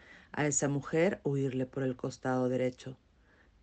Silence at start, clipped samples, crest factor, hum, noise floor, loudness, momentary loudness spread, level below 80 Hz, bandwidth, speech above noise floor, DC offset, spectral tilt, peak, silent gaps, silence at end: 0.1 s; under 0.1%; 16 dB; none; -64 dBFS; -33 LUFS; 8 LU; -66 dBFS; 9.4 kHz; 32 dB; under 0.1%; -5.5 dB/octave; -16 dBFS; none; 0.65 s